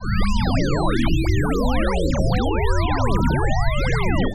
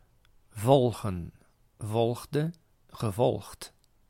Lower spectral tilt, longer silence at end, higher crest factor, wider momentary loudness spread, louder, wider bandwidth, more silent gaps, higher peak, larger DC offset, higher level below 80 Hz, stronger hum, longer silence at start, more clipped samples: about the same, -6.5 dB/octave vs -7 dB/octave; second, 0 s vs 0.4 s; second, 12 dB vs 22 dB; second, 1 LU vs 22 LU; first, -21 LUFS vs -29 LUFS; second, 13 kHz vs 16.5 kHz; neither; about the same, -6 dBFS vs -8 dBFS; neither; first, -22 dBFS vs -58 dBFS; neither; second, 0 s vs 0.55 s; neither